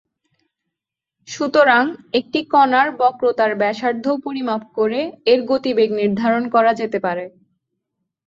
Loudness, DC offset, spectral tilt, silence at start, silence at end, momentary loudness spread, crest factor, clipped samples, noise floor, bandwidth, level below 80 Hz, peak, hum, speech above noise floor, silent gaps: -18 LUFS; under 0.1%; -5 dB/octave; 1.3 s; 1 s; 9 LU; 18 dB; under 0.1%; -84 dBFS; 7.6 kHz; -64 dBFS; -2 dBFS; none; 67 dB; none